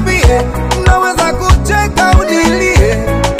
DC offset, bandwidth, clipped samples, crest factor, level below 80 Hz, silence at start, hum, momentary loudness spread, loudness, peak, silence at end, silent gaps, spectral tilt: under 0.1%; 15.5 kHz; 0.5%; 10 dB; -14 dBFS; 0 s; none; 3 LU; -10 LUFS; 0 dBFS; 0 s; none; -5 dB/octave